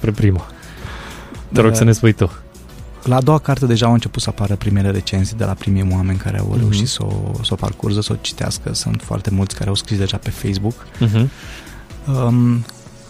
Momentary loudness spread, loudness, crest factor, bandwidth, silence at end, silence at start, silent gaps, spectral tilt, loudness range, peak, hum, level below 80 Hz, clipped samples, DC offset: 18 LU; -17 LUFS; 16 dB; 15 kHz; 0 s; 0 s; none; -6 dB/octave; 4 LU; 0 dBFS; none; -36 dBFS; under 0.1%; under 0.1%